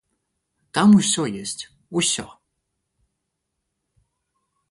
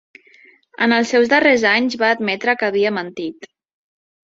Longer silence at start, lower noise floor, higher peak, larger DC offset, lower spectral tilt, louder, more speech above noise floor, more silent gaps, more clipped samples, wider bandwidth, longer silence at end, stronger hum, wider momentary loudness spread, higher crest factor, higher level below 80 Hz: about the same, 0.75 s vs 0.8 s; first, -78 dBFS vs -50 dBFS; second, -6 dBFS vs -2 dBFS; neither; about the same, -4 dB/octave vs -4 dB/octave; second, -20 LUFS vs -16 LUFS; first, 60 dB vs 34 dB; neither; neither; first, 11.5 kHz vs 7.8 kHz; first, 2.45 s vs 0.9 s; neither; first, 15 LU vs 12 LU; about the same, 18 dB vs 18 dB; about the same, -62 dBFS vs -64 dBFS